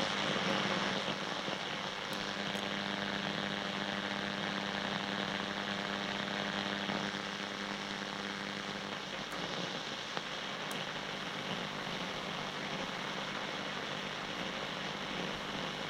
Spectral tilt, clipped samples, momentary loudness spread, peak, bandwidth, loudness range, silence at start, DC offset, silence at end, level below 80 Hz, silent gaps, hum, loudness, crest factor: -3.5 dB/octave; under 0.1%; 4 LU; -16 dBFS; 16 kHz; 3 LU; 0 s; under 0.1%; 0 s; -68 dBFS; none; none; -37 LUFS; 24 dB